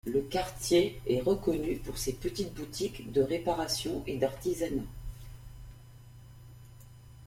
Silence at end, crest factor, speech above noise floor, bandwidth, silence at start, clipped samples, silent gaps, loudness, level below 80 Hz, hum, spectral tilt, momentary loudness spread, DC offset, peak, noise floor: 0 s; 20 dB; 20 dB; 16.5 kHz; 0.05 s; under 0.1%; none; -32 LUFS; -48 dBFS; none; -5 dB/octave; 24 LU; under 0.1%; -14 dBFS; -52 dBFS